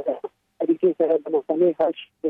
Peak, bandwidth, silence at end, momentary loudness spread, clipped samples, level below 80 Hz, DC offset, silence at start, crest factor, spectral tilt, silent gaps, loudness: -8 dBFS; 3.8 kHz; 0 s; 10 LU; under 0.1%; -74 dBFS; under 0.1%; 0 s; 14 dB; -9 dB/octave; none; -22 LUFS